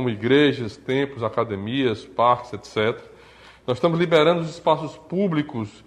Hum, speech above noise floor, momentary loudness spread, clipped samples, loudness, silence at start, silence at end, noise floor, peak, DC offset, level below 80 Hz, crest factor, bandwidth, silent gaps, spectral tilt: none; 26 dB; 11 LU; under 0.1%; -22 LUFS; 0 s; 0.15 s; -48 dBFS; -4 dBFS; under 0.1%; -58 dBFS; 18 dB; 10.5 kHz; none; -6.5 dB/octave